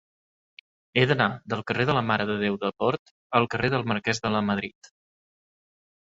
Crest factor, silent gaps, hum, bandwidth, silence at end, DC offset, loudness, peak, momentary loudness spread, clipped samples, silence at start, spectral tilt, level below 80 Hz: 22 dB; 2.99-3.30 s; none; 8 kHz; 1.45 s; under 0.1%; -25 LUFS; -4 dBFS; 6 LU; under 0.1%; 0.95 s; -5.5 dB/octave; -58 dBFS